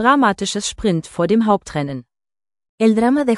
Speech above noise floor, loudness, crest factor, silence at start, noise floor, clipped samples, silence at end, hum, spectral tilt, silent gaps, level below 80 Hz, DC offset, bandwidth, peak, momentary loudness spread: over 74 dB; -18 LUFS; 16 dB; 0 s; under -90 dBFS; under 0.1%; 0 s; none; -5 dB/octave; 2.69-2.78 s; -46 dBFS; under 0.1%; 12 kHz; 0 dBFS; 10 LU